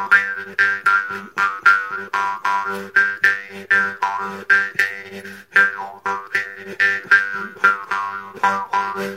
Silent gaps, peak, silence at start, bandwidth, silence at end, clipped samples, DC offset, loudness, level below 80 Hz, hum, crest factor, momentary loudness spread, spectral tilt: none; 0 dBFS; 0 s; 16 kHz; 0 s; under 0.1%; under 0.1%; -18 LUFS; -70 dBFS; none; 20 dB; 11 LU; -2.5 dB/octave